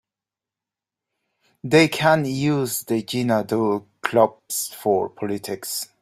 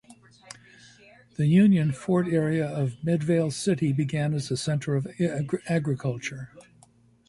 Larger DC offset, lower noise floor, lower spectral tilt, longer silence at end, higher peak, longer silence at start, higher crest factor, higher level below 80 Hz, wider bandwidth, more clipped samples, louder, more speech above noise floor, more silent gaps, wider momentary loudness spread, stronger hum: neither; first, -89 dBFS vs -59 dBFS; second, -4.5 dB/octave vs -7 dB/octave; second, 0.15 s vs 0.65 s; first, -2 dBFS vs -10 dBFS; first, 1.65 s vs 0.1 s; about the same, 20 dB vs 16 dB; about the same, -62 dBFS vs -60 dBFS; first, 16 kHz vs 11.5 kHz; neither; first, -21 LUFS vs -25 LUFS; first, 68 dB vs 34 dB; neither; second, 10 LU vs 21 LU; neither